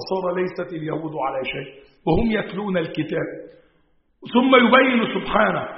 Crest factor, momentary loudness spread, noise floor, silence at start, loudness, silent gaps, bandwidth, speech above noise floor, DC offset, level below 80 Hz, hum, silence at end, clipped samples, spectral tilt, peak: 20 dB; 15 LU; -62 dBFS; 0 s; -20 LUFS; none; 5.8 kHz; 41 dB; under 0.1%; -44 dBFS; none; 0 s; under 0.1%; -3.5 dB/octave; -2 dBFS